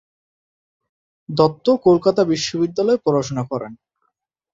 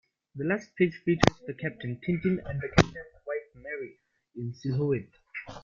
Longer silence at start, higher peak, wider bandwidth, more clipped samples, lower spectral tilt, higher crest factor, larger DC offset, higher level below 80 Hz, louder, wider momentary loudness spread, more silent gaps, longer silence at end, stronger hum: first, 1.3 s vs 0.35 s; about the same, 0 dBFS vs 0 dBFS; about the same, 7.8 kHz vs 7.6 kHz; neither; about the same, -6 dB/octave vs -6 dB/octave; second, 20 dB vs 30 dB; neither; second, -56 dBFS vs -48 dBFS; first, -18 LUFS vs -30 LUFS; second, 12 LU vs 17 LU; neither; first, 0.8 s vs 0.05 s; neither